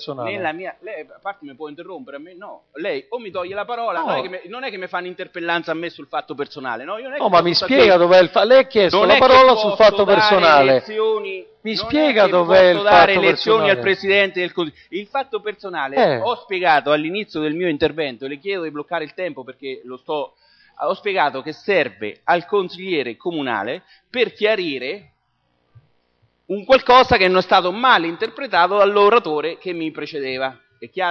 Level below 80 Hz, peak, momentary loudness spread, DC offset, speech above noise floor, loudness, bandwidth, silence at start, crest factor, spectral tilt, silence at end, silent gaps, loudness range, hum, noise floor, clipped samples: -52 dBFS; -2 dBFS; 19 LU; under 0.1%; 49 dB; -17 LUFS; 6.6 kHz; 0 s; 16 dB; -5.5 dB/octave; 0 s; none; 13 LU; none; -67 dBFS; under 0.1%